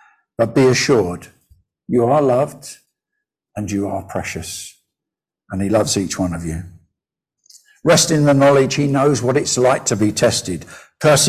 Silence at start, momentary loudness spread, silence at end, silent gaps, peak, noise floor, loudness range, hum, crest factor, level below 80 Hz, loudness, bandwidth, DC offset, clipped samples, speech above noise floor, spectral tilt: 0.4 s; 17 LU; 0 s; none; -2 dBFS; -86 dBFS; 8 LU; none; 16 dB; -44 dBFS; -16 LUFS; 16 kHz; under 0.1%; under 0.1%; 70 dB; -4.5 dB/octave